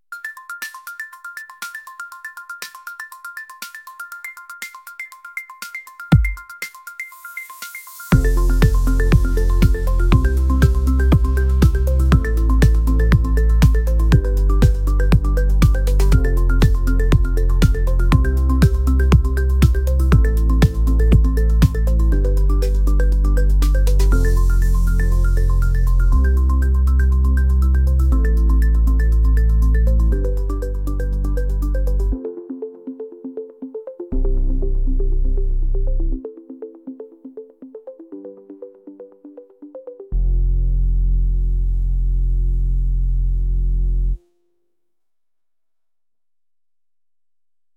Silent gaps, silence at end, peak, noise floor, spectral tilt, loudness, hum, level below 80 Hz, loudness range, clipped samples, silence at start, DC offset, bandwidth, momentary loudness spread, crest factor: none; 3.6 s; 0 dBFS; under -90 dBFS; -7 dB/octave; -18 LUFS; none; -16 dBFS; 15 LU; under 0.1%; 0.1 s; under 0.1%; 15.5 kHz; 17 LU; 16 dB